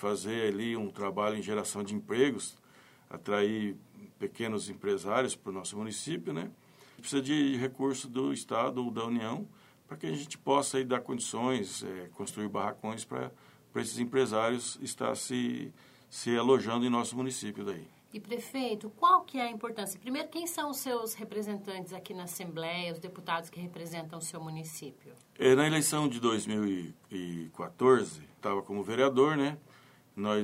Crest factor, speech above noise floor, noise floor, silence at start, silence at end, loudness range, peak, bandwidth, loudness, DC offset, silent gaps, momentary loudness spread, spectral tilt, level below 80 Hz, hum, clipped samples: 22 dB; 27 dB; -59 dBFS; 0 s; 0 s; 6 LU; -10 dBFS; 16 kHz; -33 LUFS; under 0.1%; none; 15 LU; -4.5 dB/octave; -76 dBFS; none; under 0.1%